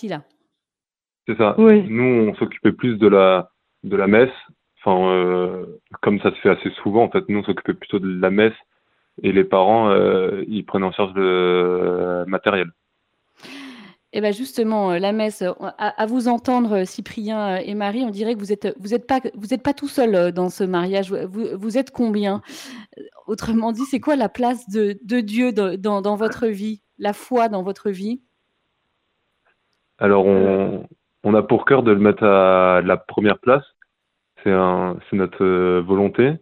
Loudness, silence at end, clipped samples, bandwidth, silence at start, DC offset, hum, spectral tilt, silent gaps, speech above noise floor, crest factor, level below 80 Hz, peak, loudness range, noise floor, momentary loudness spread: -19 LUFS; 0.05 s; under 0.1%; 15 kHz; 0 s; under 0.1%; none; -7 dB/octave; none; over 72 dB; 20 dB; -58 dBFS; 0 dBFS; 7 LU; under -90 dBFS; 12 LU